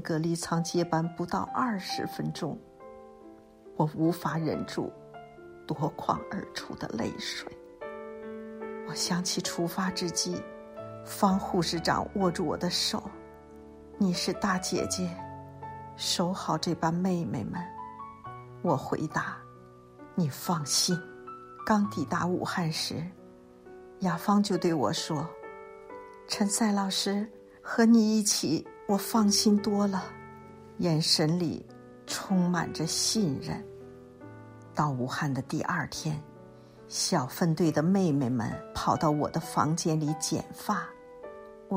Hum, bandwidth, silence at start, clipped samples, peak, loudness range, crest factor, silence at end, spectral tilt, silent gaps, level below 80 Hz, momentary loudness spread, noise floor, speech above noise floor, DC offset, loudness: none; 16 kHz; 0 s; under 0.1%; -10 dBFS; 7 LU; 20 dB; 0 s; -4.5 dB/octave; none; -60 dBFS; 20 LU; -52 dBFS; 23 dB; under 0.1%; -29 LUFS